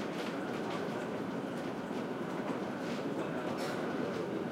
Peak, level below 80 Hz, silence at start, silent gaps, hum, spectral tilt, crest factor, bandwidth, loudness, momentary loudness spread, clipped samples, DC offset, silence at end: -24 dBFS; -72 dBFS; 0 s; none; none; -6 dB/octave; 14 dB; 16 kHz; -38 LUFS; 2 LU; under 0.1%; under 0.1%; 0 s